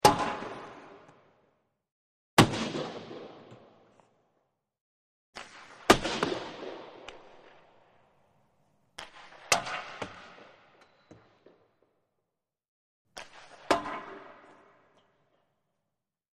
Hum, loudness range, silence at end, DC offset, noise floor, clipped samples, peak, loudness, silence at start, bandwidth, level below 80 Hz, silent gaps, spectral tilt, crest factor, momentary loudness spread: none; 13 LU; 2 s; under 0.1%; -87 dBFS; under 0.1%; -4 dBFS; -29 LUFS; 0.05 s; 13 kHz; -56 dBFS; 1.92-2.37 s, 4.81-5.33 s, 12.68-13.05 s; -3.5 dB/octave; 32 dB; 26 LU